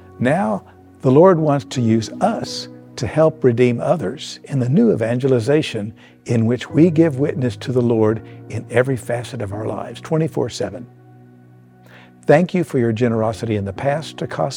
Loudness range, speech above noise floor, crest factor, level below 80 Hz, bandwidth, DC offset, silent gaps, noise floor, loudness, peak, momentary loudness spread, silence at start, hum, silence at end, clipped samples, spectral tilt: 6 LU; 29 dB; 18 dB; -56 dBFS; 15 kHz; under 0.1%; none; -46 dBFS; -18 LUFS; 0 dBFS; 12 LU; 0.2 s; none; 0 s; under 0.1%; -7 dB/octave